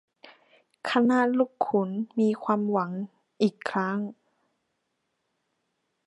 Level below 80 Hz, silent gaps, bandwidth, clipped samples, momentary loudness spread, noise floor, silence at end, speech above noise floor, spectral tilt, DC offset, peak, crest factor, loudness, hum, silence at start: -80 dBFS; none; 11 kHz; under 0.1%; 12 LU; -78 dBFS; 1.95 s; 53 dB; -7 dB/octave; under 0.1%; -8 dBFS; 20 dB; -27 LUFS; none; 0.25 s